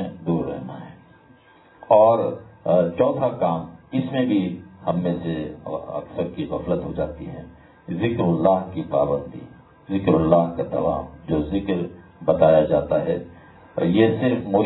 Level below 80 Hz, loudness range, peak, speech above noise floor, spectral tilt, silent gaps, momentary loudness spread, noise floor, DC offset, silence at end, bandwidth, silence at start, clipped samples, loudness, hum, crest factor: -48 dBFS; 5 LU; -2 dBFS; 31 dB; -12 dB/octave; none; 14 LU; -52 dBFS; under 0.1%; 0 s; 4.1 kHz; 0 s; under 0.1%; -22 LUFS; none; 20 dB